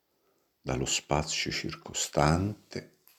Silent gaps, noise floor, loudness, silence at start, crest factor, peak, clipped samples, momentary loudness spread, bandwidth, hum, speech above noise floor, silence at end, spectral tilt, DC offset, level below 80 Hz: none; -73 dBFS; -30 LUFS; 0.65 s; 24 dB; -8 dBFS; under 0.1%; 16 LU; 15.5 kHz; none; 42 dB; 0.35 s; -4 dB/octave; under 0.1%; -48 dBFS